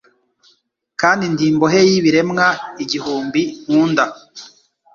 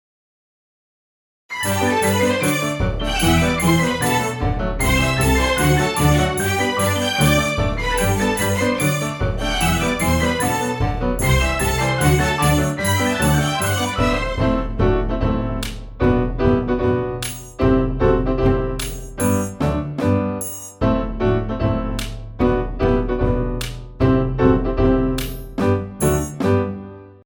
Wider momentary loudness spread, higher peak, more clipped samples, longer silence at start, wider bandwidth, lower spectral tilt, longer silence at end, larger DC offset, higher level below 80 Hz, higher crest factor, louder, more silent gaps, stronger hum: first, 14 LU vs 7 LU; about the same, 0 dBFS vs -2 dBFS; neither; second, 1 s vs 1.5 s; second, 7.4 kHz vs over 20 kHz; about the same, -5 dB/octave vs -5 dB/octave; first, 0.5 s vs 0.15 s; neither; second, -58 dBFS vs -28 dBFS; about the same, 16 dB vs 18 dB; first, -16 LUFS vs -19 LUFS; neither; neither